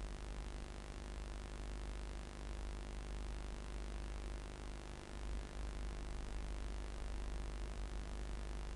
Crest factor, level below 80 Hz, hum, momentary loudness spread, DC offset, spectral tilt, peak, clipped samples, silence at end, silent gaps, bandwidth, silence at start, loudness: 14 dB; -46 dBFS; none; 3 LU; under 0.1%; -5 dB/octave; -30 dBFS; under 0.1%; 0 s; none; 11.5 kHz; 0 s; -49 LUFS